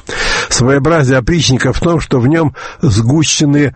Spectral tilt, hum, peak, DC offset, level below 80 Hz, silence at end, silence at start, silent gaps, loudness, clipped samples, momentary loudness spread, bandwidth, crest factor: -5 dB/octave; none; 0 dBFS; under 0.1%; -28 dBFS; 0 s; 0.05 s; none; -11 LUFS; under 0.1%; 4 LU; 8.8 kHz; 12 dB